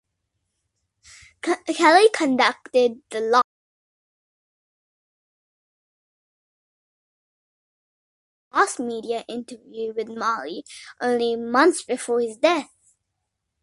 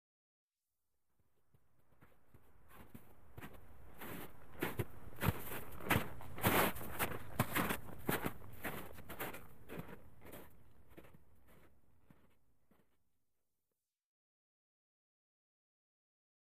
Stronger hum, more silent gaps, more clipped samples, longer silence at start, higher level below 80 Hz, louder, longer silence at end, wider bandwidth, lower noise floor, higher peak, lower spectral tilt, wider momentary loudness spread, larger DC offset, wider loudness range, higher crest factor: neither; first, 3.44-8.51 s vs none; neither; first, 1.45 s vs 0.45 s; second, -72 dBFS vs -62 dBFS; first, -21 LUFS vs -41 LUFS; second, 1 s vs 2.35 s; second, 11.5 kHz vs 15.5 kHz; second, -79 dBFS vs under -90 dBFS; first, -2 dBFS vs -18 dBFS; second, -2.5 dB/octave vs -4.5 dB/octave; second, 15 LU vs 23 LU; second, under 0.1% vs 0.2%; second, 9 LU vs 21 LU; about the same, 22 dB vs 26 dB